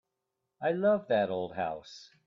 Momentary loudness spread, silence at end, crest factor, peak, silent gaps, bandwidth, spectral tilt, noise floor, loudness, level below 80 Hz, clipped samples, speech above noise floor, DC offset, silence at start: 13 LU; 0.2 s; 16 dB; -16 dBFS; none; 7.4 kHz; -6.5 dB/octave; -85 dBFS; -31 LUFS; -72 dBFS; under 0.1%; 54 dB; under 0.1%; 0.6 s